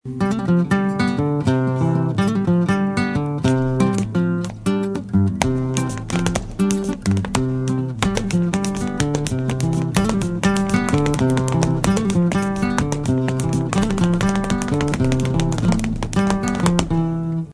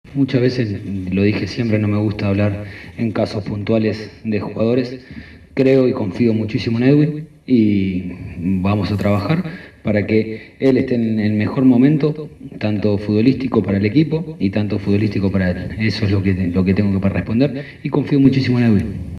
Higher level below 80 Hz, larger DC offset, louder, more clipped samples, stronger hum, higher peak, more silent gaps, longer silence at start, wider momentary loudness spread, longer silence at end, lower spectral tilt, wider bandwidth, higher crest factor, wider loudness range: first, -34 dBFS vs -44 dBFS; neither; second, -20 LUFS vs -17 LUFS; neither; neither; about the same, 0 dBFS vs 0 dBFS; neither; about the same, 0.05 s vs 0.05 s; second, 4 LU vs 11 LU; about the same, 0 s vs 0 s; second, -6 dB/octave vs -8.5 dB/octave; first, 11 kHz vs 9.6 kHz; about the same, 18 dB vs 16 dB; about the same, 2 LU vs 3 LU